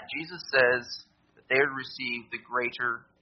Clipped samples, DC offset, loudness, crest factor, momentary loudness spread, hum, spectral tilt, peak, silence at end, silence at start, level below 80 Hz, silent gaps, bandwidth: under 0.1%; under 0.1%; -28 LUFS; 22 dB; 12 LU; none; -1 dB/octave; -8 dBFS; 0.2 s; 0 s; -70 dBFS; none; 6.4 kHz